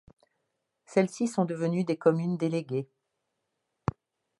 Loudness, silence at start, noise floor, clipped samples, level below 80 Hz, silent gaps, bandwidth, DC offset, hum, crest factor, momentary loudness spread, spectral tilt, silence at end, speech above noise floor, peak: -29 LUFS; 0.9 s; -81 dBFS; under 0.1%; -62 dBFS; none; 11.5 kHz; under 0.1%; none; 22 dB; 10 LU; -7 dB/octave; 1.55 s; 54 dB; -8 dBFS